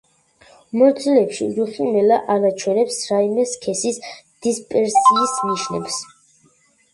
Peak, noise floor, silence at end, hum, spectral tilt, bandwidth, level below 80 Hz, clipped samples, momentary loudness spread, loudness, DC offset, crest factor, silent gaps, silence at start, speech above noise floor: -2 dBFS; -58 dBFS; 0.9 s; none; -4 dB/octave; 11.5 kHz; -64 dBFS; under 0.1%; 12 LU; -18 LUFS; under 0.1%; 16 dB; none; 0.75 s; 40 dB